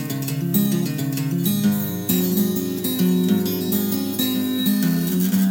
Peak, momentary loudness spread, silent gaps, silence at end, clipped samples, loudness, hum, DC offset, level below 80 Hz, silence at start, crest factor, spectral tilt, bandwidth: -6 dBFS; 4 LU; none; 0 s; under 0.1%; -21 LUFS; none; under 0.1%; -60 dBFS; 0 s; 14 dB; -5.5 dB/octave; 18.5 kHz